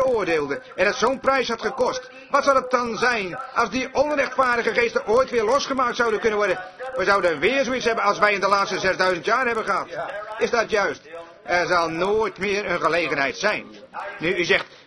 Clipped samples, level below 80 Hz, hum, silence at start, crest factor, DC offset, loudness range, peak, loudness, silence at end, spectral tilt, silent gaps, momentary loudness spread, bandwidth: under 0.1%; -54 dBFS; none; 0 s; 20 dB; under 0.1%; 2 LU; -2 dBFS; -21 LUFS; 0.1 s; -3.5 dB/octave; none; 7 LU; 11 kHz